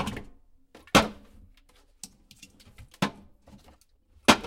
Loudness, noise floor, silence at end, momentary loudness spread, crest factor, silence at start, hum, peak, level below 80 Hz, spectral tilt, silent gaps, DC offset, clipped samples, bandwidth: -26 LUFS; -61 dBFS; 0 s; 24 LU; 30 dB; 0 s; none; -2 dBFS; -50 dBFS; -3.5 dB/octave; none; under 0.1%; under 0.1%; 16.5 kHz